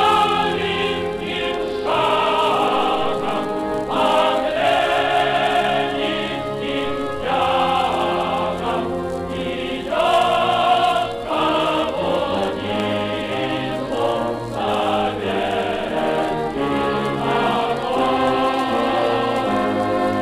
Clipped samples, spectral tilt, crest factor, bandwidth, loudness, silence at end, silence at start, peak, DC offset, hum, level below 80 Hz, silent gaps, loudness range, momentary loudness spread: under 0.1%; -5 dB/octave; 16 dB; 15.5 kHz; -20 LUFS; 0 s; 0 s; -4 dBFS; under 0.1%; none; -46 dBFS; none; 3 LU; 6 LU